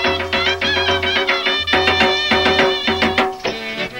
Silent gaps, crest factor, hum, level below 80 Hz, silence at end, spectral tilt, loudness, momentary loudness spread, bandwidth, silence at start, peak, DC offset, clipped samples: none; 14 dB; none; -42 dBFS; 0 s; -3.5 dB/octave; -15 LUFS; 6 LU; 16 kHz; 0 s; -2 dBFS; under 0.1%; under 0.1%